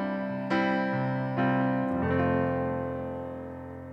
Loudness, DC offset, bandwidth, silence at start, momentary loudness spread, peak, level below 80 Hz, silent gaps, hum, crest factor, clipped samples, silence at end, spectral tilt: -29 LUFS; under 0.1%; 6.6 kHz; 0 s; 11 LU; -14 dBFS; -60 dBFS; none; none; 14 dB; under 0.1%; 0 s; -9 dB/octave